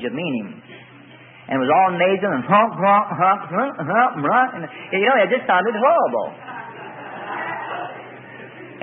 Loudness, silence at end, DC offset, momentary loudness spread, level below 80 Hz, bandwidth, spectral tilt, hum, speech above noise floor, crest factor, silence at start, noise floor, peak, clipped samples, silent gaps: -19 LUFS; 0 s; under 0.1%; 19 LU; -72 dBFS; 3.9 kHz; -10.5 dB/octave; none; 26 dB; 18 dB; 0 s; -44 dBFS; -2 dBFS; under 0.1%; none